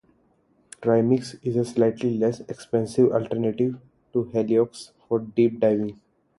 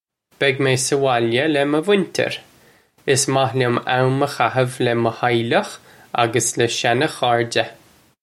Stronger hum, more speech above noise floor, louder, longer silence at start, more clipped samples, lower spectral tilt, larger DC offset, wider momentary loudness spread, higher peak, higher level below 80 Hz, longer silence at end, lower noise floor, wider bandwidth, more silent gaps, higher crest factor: neither; first, 41 dB vs 35 dB; second, -24 LUFS vs -19 LUFS; first, 0.8 s vs 0.4 s; neither; first, -7.5 dB/octave vs -4 dB/octave; neither; first, 8 LU vs 5 LU; second, -6 dBFS vs -2 dBFS; about the same, -62 dBFS vs -62 dBFS; about the same, 0.45 s vs 0.5 s; first, -64 dBFS vs -53 dBFS; second, 11.5 kHz vs 15.5 kHz; neither; about the same, 18 dB vs 18 dB